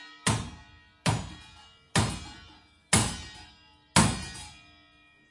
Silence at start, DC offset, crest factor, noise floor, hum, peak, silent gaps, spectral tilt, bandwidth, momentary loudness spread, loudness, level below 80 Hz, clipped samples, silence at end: 0 s; under 0.1%; 26 dB; -60 dBFS; none; -6 dBFS; none; -3.5 dB/octave; 11.5 kHz; 22 LU; -28 LUFS; -48 dBFS; under 0.1%; 0.8 s